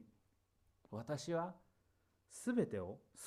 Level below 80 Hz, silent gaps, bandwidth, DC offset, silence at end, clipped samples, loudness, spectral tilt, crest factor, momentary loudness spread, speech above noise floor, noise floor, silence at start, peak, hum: -78 dBFS; none; 14.5 kHz; under 0.1%; 0 s; under 0.1%; -43 LUFS; -6 dB/octave; 20 dB; 12 LU; 36 dB; -78 dBFS; 0 s; -24 dBFS; none